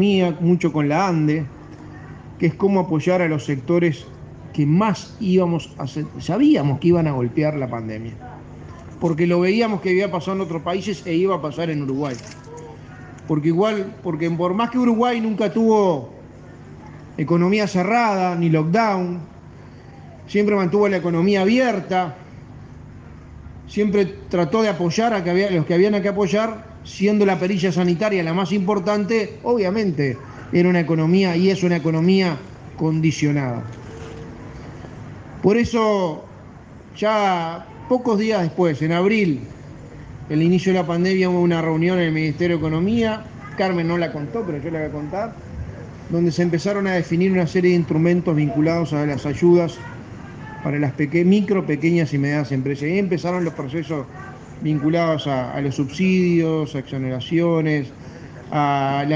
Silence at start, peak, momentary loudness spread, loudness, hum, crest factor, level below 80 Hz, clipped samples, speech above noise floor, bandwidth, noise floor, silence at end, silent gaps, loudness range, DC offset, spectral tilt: 0 s; -4 dBFS; 19 LU; -20 LUFS; 50 Hz at -45 dBFS; 16 dB; -50 dBFS; under 0.1%; 22 dB; 7.6 kHz; -41 dBFS; 0 s; none; 4 LU; under 0.1%; -7 dB/octave